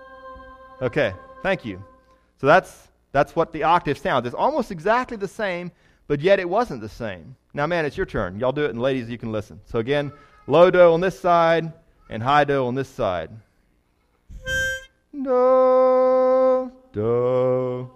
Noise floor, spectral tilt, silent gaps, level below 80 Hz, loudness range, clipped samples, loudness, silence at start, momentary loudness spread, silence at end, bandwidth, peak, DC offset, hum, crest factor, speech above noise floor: -65 dBFS; -6 dB/octave; none; -48 dBFS; 6 LU; under 0.1%; -21 LUFS; 0 s; 17 LU; 0.05 s; 13 kHz; -2 dBFS; under 0.1%; none; 18 dB; 44 dB